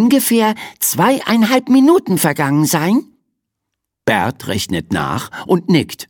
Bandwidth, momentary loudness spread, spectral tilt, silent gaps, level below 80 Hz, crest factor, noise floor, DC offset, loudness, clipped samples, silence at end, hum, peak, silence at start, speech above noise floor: 19 kHz; 8 LU; -4.5 dB/octave; none; -50 dBFS; 14 dB; -77 dBFS; under 0.1%; -15 LUFS; under 0.1%; 0.05 s; none; 0 dBFS; 0 s; 63 dB